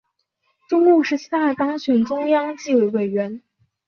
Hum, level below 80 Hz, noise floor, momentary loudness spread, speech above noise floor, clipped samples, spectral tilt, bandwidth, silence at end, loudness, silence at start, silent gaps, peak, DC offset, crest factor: none; -68 dBFS; -70 dBFS; 8 LU; 52 dB; under 0.1%; -6 dB/octave; 6.8 kHz; 0.5 s; -19 LUFS; 0.7 s; none; -4 dBFS; under 0.1%; 16 dB